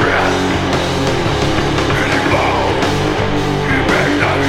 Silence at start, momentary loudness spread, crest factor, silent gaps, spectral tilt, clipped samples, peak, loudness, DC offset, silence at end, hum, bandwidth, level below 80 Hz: 0 s; 3 LU; 14 dB; none; -5 dB/octave; under 0.1%; 0 dBFS; -14 LUFS; under 0.1%; 0 s; none; 16 kHz; -28 dBFS